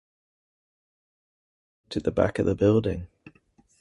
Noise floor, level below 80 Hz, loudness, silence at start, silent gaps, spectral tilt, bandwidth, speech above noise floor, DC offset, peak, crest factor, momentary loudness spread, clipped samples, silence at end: -62 dBFS; -48 dBFS; -25 LUFS; 1.9 s; none; -8 dB/octave; 11.5 kHz; 39 dB; under 0.1%; -8 dBFS; 20 dB; 14 LU; under 0.1%; 0.75 s